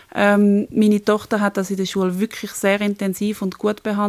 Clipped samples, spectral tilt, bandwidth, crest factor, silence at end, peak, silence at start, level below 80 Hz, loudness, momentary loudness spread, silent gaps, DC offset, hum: under 0.1%; -6 dB/octave; 15.5 kHz; 16 dB; 0 s; -4 dBFS; 0.15 s; -58 dBFS; -19 LUFS; 7 LU; none; under 0.1%; none